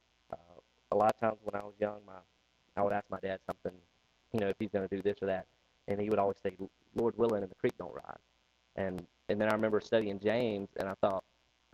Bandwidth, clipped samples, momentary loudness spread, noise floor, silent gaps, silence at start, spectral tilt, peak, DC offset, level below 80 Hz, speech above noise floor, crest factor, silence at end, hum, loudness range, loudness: 14 kHz; under 0.1%; 17 LU; -62 dBFS; none; 0.3 s; -7 dB/octave; -14 dBFS; under 0.1%; -68 dBFS; 28 dB; 20 dB; 0.55 s; none; 4 LU; -35 LUFS